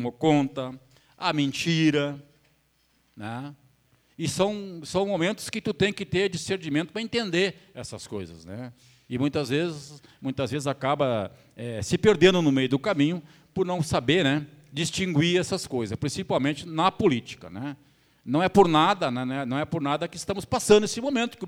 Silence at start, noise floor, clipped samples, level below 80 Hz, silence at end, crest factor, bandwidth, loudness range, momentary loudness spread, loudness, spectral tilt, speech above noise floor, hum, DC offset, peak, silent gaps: 0 s; -67 dBFS; under 0.1%; -56 dBFS; 0 s; 22 dB; 16 kHz; 7 LU; 17 LU; -25 LUFS; -5 dB/octave; 42 dB; none; under 0.1%; -4 dBFS; none